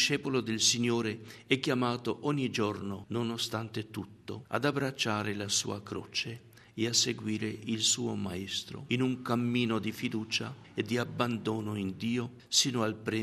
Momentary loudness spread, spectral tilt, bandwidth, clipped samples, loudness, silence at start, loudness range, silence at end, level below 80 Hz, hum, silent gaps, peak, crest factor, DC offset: 11 LU; -3.5 dB/octave; 13.5 kHz; under 0.1%; -31 LUFS; 0 s; 3 LU; 0 s; -70 dBFS; none; none; -10 dBFS; 22 dB; under 0.1%